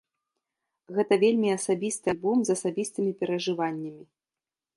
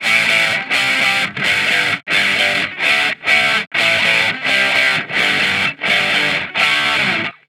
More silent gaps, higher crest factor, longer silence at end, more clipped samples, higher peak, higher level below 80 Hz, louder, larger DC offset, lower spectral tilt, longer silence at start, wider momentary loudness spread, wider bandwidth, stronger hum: second, none vs 3.67-3.71 s; about the same, 18 dB vs 16 dB; first, 0.75 s vs 0.15 s; neither; second, -10 dBFS vs 0 dBFS; second, -70 dBFS vs -56 dBFS; second, -27 LUFS vs -13 LUFS; neither; first, -5 dB/octave vs -1.5 dB/octave; first, 0.9 s vs 0 s; first, 9 LU vs 3 LU; second, 11.5 kHz vs 18 kHz; neither